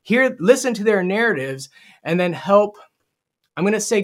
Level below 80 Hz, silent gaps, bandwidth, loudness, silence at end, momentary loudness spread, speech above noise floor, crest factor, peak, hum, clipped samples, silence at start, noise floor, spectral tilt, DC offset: -70 dBFS; none; 16 kHz; -18 LUFS; 0 s; 16 LU; 57 dB; 18 dB; 0 dBFS; none; under 0.1%; 0.05 s; -75 dBFS; -5 dB/octave; under 0.1%